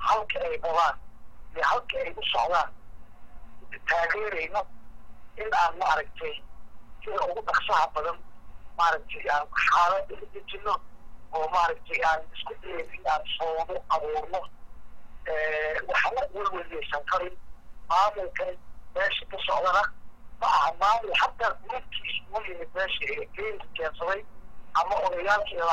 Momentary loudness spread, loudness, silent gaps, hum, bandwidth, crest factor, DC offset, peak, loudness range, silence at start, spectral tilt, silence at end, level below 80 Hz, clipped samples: 13 LU; -28 LUFS; none; none; 13 kHz; 18 dB; under 0.1%; -10 dBFS; 4 LU; 0 s; -2.5 dB/octave; 0 s; -50 dBFS; under 0.1%